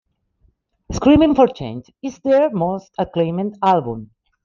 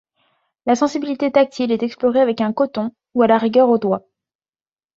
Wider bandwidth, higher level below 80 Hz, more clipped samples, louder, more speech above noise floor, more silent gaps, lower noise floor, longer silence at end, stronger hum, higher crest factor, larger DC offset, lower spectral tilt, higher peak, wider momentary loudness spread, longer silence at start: about the same, 7.2 kHz vs 7.6 kHz; first, -42 dBFS vs -64 dBFS; neither; about the same, -17 LUFS vs -18 LUFS; second, 44 dB vs over 73 dB; neither; second, -61 dBFS vs under -90 dBFS; second, 0.4 s vs 1 s; neither; about the same, 16 dB vs 16 dB; neither; about the same, -7 dB/octave vs -6 dB/octave; about the same, -2 dBFS vs -2 dBFS; first, 17 LU vs 9 LU; first, 0.9 s vs 0.65 s